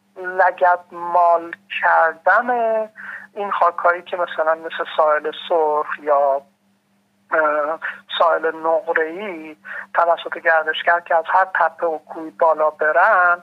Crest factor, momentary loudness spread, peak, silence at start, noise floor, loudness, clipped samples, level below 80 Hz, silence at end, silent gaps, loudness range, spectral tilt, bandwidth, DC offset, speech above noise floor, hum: 16 dB; 11 LU; -2 dBFS; 0.15 s; -62 dBFS; -18 LUFS; under 0.1%; -88 dBFS; 0 s; none; 3 LU; -4.5 dB/octave; 5.8 kHz; under 0.1%; 44 dB; none